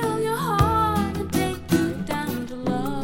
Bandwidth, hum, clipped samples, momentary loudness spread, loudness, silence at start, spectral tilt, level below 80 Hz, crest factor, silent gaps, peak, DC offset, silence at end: 17 kHz; none; under 0.1%; 7 LU; -24 LUFS; 0 s; -6 dB/octave; -40 dBFS; 18 dB; none; -4 dBFS; under 0.1%; 0 s